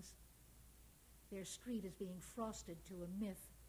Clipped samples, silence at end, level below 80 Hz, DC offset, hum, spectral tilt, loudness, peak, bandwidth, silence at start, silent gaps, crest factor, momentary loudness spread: under 0.1%; 0 s; -66 dBFS; under 0.1%; none; -5 dB/octave; -50 LUFS; -32 dBFS; over 20 kHz; 0 s; none; 18 dB; 18 LU